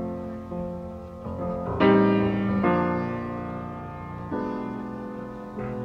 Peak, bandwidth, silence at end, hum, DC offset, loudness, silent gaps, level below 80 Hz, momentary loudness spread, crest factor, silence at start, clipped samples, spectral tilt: -8 dBFS; 6 kHz; 0 s; none; under 0.1%; -27 LUFS; none; -48 dBFS; 16 LU; 20 dB; 0 s; under 0.1%; -9 dB/octave